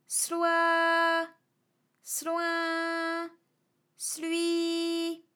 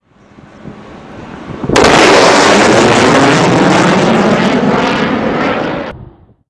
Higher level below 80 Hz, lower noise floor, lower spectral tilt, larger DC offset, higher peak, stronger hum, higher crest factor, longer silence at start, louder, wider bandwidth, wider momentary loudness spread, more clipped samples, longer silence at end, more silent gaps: second, under -90 dBFS vs -38 dBFS; first, -75 dBFS vs -40 dBFS; second, 0.5 dB/octave vs -4.5 dB/octave; neither; second, -14 dBFS vs 0 dBFS; neither; first, 16 dB vs 10 dB; second, 0.1 s vs 0.65 s; second, -29 LUFS vs -8 LUFS; first, 19.5 kHz vs 12 kHz; second, 11 LU vs 16 LU; neither; second, 0.15 s vs 0.45 s; neither